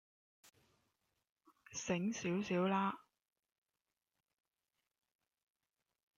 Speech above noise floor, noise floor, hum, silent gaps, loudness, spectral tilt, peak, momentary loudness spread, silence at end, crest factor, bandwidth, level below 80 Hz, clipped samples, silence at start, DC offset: over 52 dB; under -90 dBFS; none; none; -39 LUFS; -5 dB/octave; -24 dBFS; 12 LU; 3.2 s; 20 dB; 8 kHz; -80 dBFS; under 0.1%; 1.7 s; under 0.1%